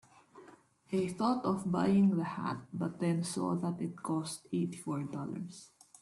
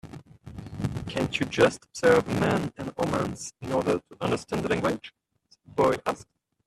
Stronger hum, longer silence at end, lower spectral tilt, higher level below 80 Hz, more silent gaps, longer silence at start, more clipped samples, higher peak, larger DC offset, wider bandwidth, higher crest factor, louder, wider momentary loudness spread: neither; about the same, 0.35 s vs 0.45 s; about the same, -6.5 dB/octave vs -5.5 dB/octave; second, -72 dBFS vs -52 dBFS; neither; first, 0.35 s vs 0.05 s; neither; second, -20 dBFS vs -6 dBFS; neither; second, 12.5 kHz vs 14 kHz; second, 16 dB vs 22 dB; second, -34 LUFS vs -27 LUFS; second, 11 LU vs 17 LU